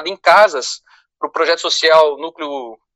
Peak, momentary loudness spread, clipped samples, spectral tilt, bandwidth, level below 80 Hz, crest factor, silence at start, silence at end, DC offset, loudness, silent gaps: 0 dBFS; 16 LU; under 0.1%; -0.5 dB/octave; 13 kHz; -68 dBFS; 14 dB; 0 s; 0.2 s; under 0.1%; -13 LUFS; none